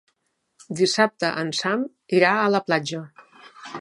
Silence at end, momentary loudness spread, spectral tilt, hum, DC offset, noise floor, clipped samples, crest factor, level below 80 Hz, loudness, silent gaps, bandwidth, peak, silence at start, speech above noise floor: 0 s; 16 LU; -4 dB/octave; none; under 0.1%; -73 dBFS; under 0.1%; 20 dB; -74 dBFS; -22 LUFS; none; 11.5 kHz; -2 dBFS; 0.7 s; 51 dB